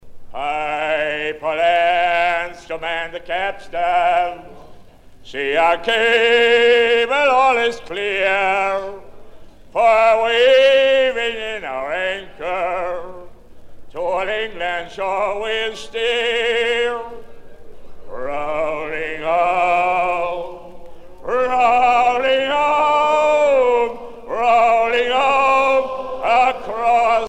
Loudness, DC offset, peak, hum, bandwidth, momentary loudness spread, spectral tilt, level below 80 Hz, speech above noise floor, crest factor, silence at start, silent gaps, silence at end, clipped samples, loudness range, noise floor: -17 LUFS; under 0.1%; -2 dBFS; none; 11.5 kHz; 13 LU; -3 dB/octave; -46 dBFS; 23 dB; 16 dB; 0.05 s; none; 0 s; under 0.1%; 7 LU; -41 dBFS